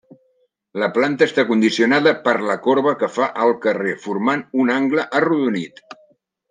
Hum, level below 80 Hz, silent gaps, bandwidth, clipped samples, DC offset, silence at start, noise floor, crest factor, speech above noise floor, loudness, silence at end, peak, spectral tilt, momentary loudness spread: none; -70 dBFS; none; 9.6 kHz; under 0.1%; under 0.1%; 0.75 s; -64 dBFS; 18 dB; 46 dB; -18 LUFS; 0.85 s; -2 dBFS; -5.5 dB/octave; 7 LU